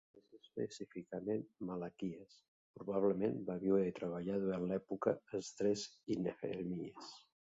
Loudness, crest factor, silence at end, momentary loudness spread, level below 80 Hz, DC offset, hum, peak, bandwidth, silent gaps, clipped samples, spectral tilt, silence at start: -40 LUFS; 20 dB; 0.35 s; 14 LU; -74 dBFS; under 0.1%; none; -20 dBFS; 7.8 kHz; 2.48-2.74 s; under 0.1%; -6.5 dB/octave; 0.15 s